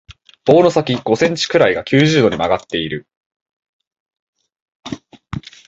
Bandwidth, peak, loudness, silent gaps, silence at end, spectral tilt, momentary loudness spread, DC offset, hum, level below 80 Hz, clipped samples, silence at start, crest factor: 8 kHz; 0 dBFS; -15 LUFS; 3.17-3.46 s, 3.53-3.60 s, 3.69-3.80 s, 3.87-3.91 s, 4.00-4.06 s, 4.19-4.33 s, 4.62-4.66 s, 4.75-4.83 s; 0.3 s; -5.5 dB/octave; 19 LU; under 0.1%; none; -48 dBFS; under 0.1%; 0.1 s; 18 dB